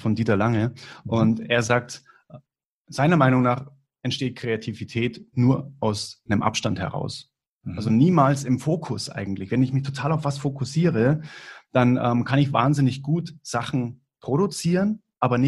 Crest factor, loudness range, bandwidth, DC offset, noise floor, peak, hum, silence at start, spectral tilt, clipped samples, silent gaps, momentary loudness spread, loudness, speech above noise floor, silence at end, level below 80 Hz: 20 dB; 3 LU; 12 kHz; under 0.1%; -66 dBFS; -2 dBFS; none; 0 s; -6.5 dB/octave; under 0.1%; 2.65-2.85 s, 7.49-7.59 s; 11 LU; -23 LUFS; 44 dB; 0 s; -56 dBFS